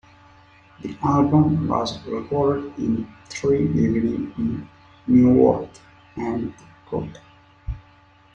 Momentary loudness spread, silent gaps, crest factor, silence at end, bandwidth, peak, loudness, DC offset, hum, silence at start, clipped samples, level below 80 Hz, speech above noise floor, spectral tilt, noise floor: 19 LU; none; 18 dB; 0.55 s; 8 kHz; -4 dBFS; -21 LUFS; under 0.1%; none; 0.8 s; under 0.1%; -46 dBFS; 32 dB; -8 dB/octave; -53 dBFS